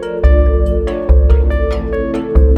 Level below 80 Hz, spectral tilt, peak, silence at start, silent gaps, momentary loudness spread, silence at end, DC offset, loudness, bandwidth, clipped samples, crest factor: -12 dBFS; -9.5 dB/octave; 0 dBFS; 0 s; none; 7 LU; 0 s; under 0.1%; -14 LUFS; 4.4 kHz; under 0.1%; 10 dB